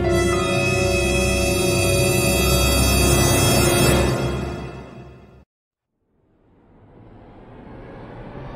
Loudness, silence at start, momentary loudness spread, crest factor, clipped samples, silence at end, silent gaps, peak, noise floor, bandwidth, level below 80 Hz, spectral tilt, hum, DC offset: -18 LUFS; 0 s; 22 LU; 16 dB; under 0.1%; 0 s; 5.46-5.71 s; -4 dBFS; -69 dBFS; 16 kHz; -30 dBFS; -4 dB/octave; none; under 0.1%